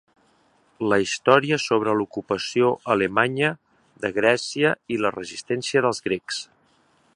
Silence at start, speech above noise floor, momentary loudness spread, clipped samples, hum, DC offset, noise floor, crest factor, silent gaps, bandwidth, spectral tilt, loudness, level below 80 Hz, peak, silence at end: 0.8 s; 40 dB; 11 LU; under 0.1%; none; under 0.1%; -62 dBFS; 22 dB; none; 11.5 kHz; -4.5 dB/octave; -22 LUFS; -62 dBFS; 0 dBFS; 0.7 s